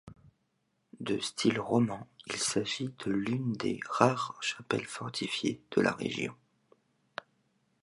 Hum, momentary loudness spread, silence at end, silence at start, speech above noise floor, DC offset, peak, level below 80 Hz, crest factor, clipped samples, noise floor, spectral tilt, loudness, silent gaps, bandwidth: none; 12 LU; 1.5 s; 0.05 s; 46 dB; under 0.1%; -8 dBFS; -70 dBFS; 26 dB; under 0.1%; -77 dBFS; -4.5 dB/octave; -32 LUFS; none; 11.5 kHz